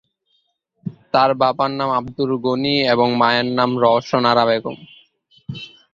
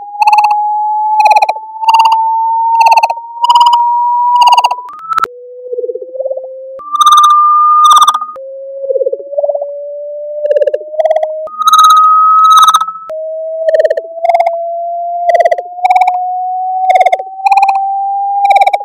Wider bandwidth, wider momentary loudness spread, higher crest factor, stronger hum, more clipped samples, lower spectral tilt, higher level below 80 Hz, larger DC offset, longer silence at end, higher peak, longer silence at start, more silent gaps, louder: second, 7.4 kHz vs 17 kHz; about the same, 18 LU vs 16 LU; first, 18 dB vs 10 dB; neither; second, under 0.1% vs 0.2%; first, -6.5 dB/octave vs 1.5 dB/octave; first, -58 dBFS vs -66 dBFS; neither; first, 0.25 s vs 0 s; about the same, -2 dBFS vs 0 dBFS; first, 0.85 s vs 0 s; neither; second, -17 LUFS vs -9 LUFS